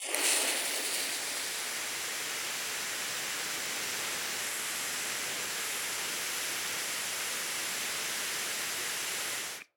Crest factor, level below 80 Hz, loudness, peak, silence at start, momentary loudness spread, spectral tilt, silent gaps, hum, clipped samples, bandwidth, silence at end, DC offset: 24 dB; -76 dBFS; -32 LUFS; -12 dBFS; 0 s; 3 LU; 1 dB/octave; none; none; under 0.1%; over 20 kHz; 0.15 s; under 0.1%